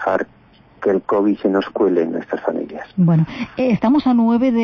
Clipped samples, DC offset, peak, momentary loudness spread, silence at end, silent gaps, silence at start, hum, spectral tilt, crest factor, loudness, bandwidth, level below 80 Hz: under 0.1%; under 0.1%; -4 dBFS; 8 LU; 0 s; none; 0 s; none; -9.5 dB/octave; 12 dB; -18 LUFS; 6.4 kHz; -54 dBFS